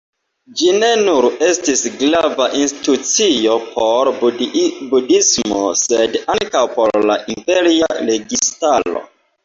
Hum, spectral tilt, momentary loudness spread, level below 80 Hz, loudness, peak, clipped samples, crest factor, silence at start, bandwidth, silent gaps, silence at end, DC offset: none; -2 dB/octave; 5 LU; -54 dBFS; -14 LUFS; -2 dBFS; under 0.1%; 14 dB; 0.5 s; 7.8 kHz; none; 0.4 s; under 0.1%